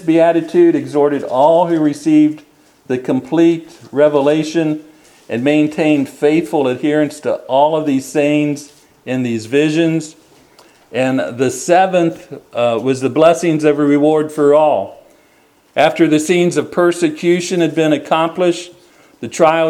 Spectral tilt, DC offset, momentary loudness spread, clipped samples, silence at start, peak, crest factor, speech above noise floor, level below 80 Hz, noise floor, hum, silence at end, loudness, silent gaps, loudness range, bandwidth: -6 dB/octave; under 0.1%; 11 LU; under 0.1%; 0 s; 0 dBFS; 14 dB; 38 dB; -62 dBFS; -52 dBFS; none; 0 s; -14 LUFS; none; 3 LU; 13 kHz